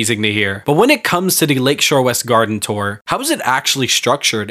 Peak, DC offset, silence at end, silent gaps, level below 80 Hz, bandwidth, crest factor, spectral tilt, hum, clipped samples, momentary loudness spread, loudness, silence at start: 0 dBFS; under 0.1%; 0 s; 3.01-3.05 s; -56 dBFS; 16 kHz; 16 dB; -3 dB/octave; none; under 0.1%; 6 LU; -14 LUFS; 0 s